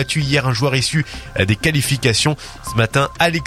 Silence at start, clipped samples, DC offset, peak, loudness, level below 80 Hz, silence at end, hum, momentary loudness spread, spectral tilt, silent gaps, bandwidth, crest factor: 0 s; under 0.1%; under 0.1%; 0 dBFS; -17 LUFS; -38 dBFS; 0 s; none; 6 LU; -4.5 dB/octave; none; 15.5 kHz; 18 dB